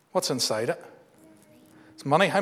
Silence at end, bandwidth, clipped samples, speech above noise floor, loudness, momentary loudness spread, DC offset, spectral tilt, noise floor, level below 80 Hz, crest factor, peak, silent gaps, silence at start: 0 s; 16 kHz; under 0.1%; 30 dB; -26 LUFS; 14 LU; under 0.1%; -3.5 dB/octave; -55 dBFS; -80 dBFS; 22 dB; -6 dBFS; none; 0.15 s